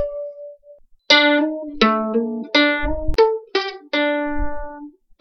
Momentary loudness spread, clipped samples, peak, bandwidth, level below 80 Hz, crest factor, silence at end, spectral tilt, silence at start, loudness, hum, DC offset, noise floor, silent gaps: 19 LU; under 0.1%; 0 dBFS; 7.6 kHz; -34 dBFS; 20 dB; 0.3 s; -4 dB/octave; 0 s; -18 LUFS; none; under 0.1%; -48 dBFS; none